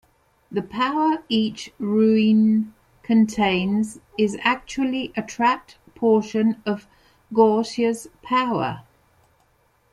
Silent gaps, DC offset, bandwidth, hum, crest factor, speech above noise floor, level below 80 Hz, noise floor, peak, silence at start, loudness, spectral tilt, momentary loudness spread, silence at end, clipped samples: none; under 0.1%; 12 kHz; none; 18 dB; 42 dB; -58 dBFS; -63 dBFS; -4 dBFS; 0.5 s; -22 LUFS; -6 dB/octave; 11 LU; 1.15 s; under 0.1%